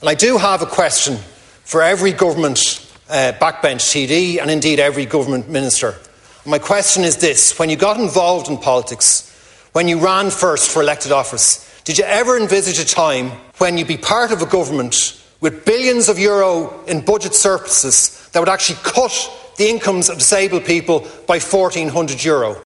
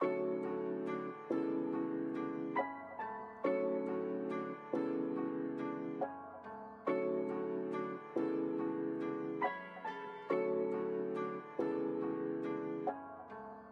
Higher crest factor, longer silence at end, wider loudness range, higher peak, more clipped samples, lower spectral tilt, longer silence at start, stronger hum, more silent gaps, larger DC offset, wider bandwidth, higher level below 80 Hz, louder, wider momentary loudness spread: about the same, 16 dB vs 18 dB; about the same, 0.05 s vs 0 s; about the same, 2 LU vs 1 LU; first, 0 dBFS vs -22 dBFS; neither; second, -2.5 dB/octave vs -8.5 dB/octave; about the same, 0 s vs 0 s; neither; neither; neither; first, 11.5 kHz vs 6.2 kHz; first, -52 dBFS vs -86 dBFS; first, -14 LUFS vs -39 LUFS; about the same, 7 LU vs 8 LU